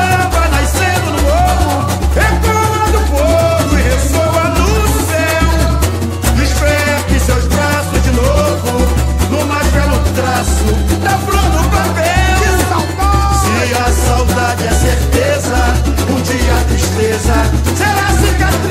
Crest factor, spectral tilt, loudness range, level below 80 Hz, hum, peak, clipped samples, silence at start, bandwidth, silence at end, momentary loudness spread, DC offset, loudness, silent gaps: 12 dB; -5 dB/octave; 1 LU; -16 dBFS; none; 0 dBFS; under 0.1%; 0 s; 16.5 kHz; 0 s; 2 LU; under 0.1%; -12 LUFS; none